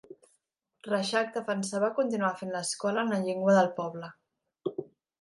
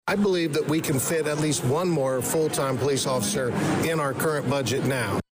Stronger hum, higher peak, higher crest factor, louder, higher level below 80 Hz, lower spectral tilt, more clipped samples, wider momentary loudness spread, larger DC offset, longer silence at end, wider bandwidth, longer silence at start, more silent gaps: neither; first, -12 dBFS vs -16 dBFS; first, 20 dB vs 8 dB; second, -29 LUFS vs -24 LUFS; second, -80 dBFS vs -56 dBFS; about the same, -4.5 dB/octave vs -4.5 dB/octave; neither; first, 15 LU vs 2 LU; neither; first, 0.4 s vs 0.1 s; second, 11.5 kHz vs 16 kHz; about the same, 0.1 s vs 0.05 s; neither